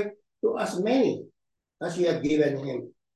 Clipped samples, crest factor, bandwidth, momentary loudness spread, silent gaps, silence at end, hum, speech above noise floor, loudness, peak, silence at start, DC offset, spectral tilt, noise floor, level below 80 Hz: under 0.1%; 16 dB; 12.5 kHz; 12 LU; none; 0.25 s; none; 26 dB; -27 LUFS; -10 dBFS; 0 s; under 0.1%; -6 dB/octave; -52 dBFS; -64 dBFS